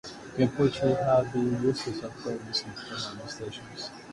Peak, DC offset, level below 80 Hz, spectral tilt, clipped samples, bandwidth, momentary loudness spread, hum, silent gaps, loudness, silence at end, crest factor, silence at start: -12 dBFS; under 0.1%; -58 dBFS; -6 dB/octave; under 0.1%; 11.5 kHz; 13 LU; none; none; -29 LUFS; 0 s; 18 dB; 0.05 s